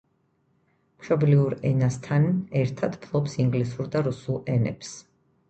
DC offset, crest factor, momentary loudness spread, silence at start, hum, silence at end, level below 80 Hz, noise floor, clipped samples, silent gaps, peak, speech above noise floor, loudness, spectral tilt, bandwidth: under 0.1%; 18 dB; 10 LU; 1 s; none; 0.5 s; -56 dBFS; -68 dBFS; under 0.1%; none; -8 dBFS; 44 dB; -25 LUFS; -8 dB/octave; 8.6 kHz